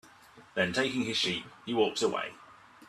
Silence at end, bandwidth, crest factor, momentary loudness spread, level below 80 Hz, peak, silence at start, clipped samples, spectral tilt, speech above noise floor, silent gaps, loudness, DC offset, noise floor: 0.05 s; 13.5 kHz; 20 dB; 8 LU; -68 dBFS; -12 dBFS; 0.05 s; under 0.1%; -3.5 dB/octave; 25 dB; none; -31 LUFS; under 0.1%; -56 dBFS